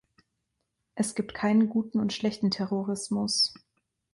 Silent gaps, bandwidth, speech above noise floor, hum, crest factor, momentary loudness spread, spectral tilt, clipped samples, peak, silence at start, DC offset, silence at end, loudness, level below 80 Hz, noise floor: none; 11.5 kHz; 53 dB; none; 14 dB; 6 LU; -4.5 dB/octave; under 0.1%; -14 dBFS; 0.95 s; under 0.1%; 0.6 s; -28 LUFS; -66 dBFS; -80 dBFS